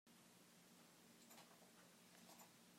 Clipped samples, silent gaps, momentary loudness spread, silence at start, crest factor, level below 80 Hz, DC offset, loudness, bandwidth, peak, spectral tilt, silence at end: under 0.1%; none; 4 LU; 0.05 s; 20 dB; under -90 dBFS; under 0.1%; -66 LUFS; 16 kHz; -48 dBFS; -2.5 dB/octave; 0 s